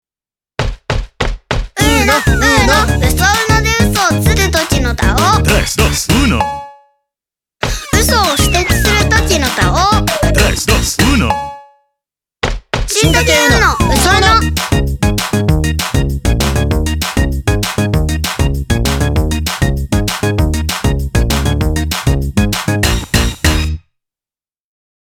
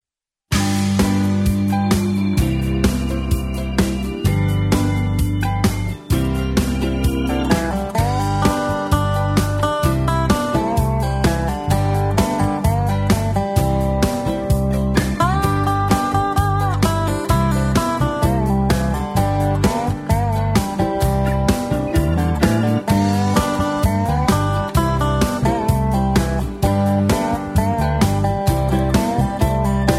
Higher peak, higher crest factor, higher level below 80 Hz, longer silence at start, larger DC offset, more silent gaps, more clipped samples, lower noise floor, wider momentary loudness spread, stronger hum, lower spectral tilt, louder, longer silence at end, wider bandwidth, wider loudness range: about the same, 0 dBFS vs 0 dBFS; about the same, 12 dB vs 16 dB; first, -20 dBFS vs -26 dBFS; about the same, 0.6 s vs 0.5 s; neither; neither; neither; first, under -90 dBFS vs -85 dBFS; first, 10 LU vs 3 LU; neither; second, -4 dB/octave vs -6.5 dB/octave; first, -12 LUFS vs -18 LUFS; first, 1.3 s vs 0 s; first, 19.5 kHz vs 16 kHz; about the same, 4 LU vs 2 LU